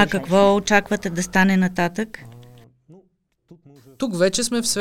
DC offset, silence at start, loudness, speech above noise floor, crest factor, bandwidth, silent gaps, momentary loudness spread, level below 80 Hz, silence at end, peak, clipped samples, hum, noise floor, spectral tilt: under 0.1%; 0 s; -19 LUFS; 44 dB; 20 dB; 16 kHz; none; 13 LU; -50 dBFS; 0 s; 0 dBFS; under 0.1%; none; -63 dBFS; -4.5 dB/octave